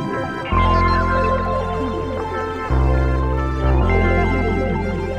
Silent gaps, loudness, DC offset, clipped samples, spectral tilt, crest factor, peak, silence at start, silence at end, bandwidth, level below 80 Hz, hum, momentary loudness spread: none; -19 LUFS; under 0.1%; under 0.1%; -8 dB/octave; 14 dB; -4 dBFS; 0 s; 0 s; 8.4 kHz; -22 dBFS; none; 7 LU